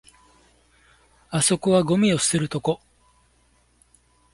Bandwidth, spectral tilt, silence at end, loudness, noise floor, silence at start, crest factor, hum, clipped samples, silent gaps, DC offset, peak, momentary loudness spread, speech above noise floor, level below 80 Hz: 11.5 kHz; -4.5 dB/octave; 1.6 s; -21 LUFS; -62 dBFS; 1.3 s; 18 dB; none; under 0.1%; none; under 0.1%; -6 dBFS; 10 LU; 41 dB; -56 dBFS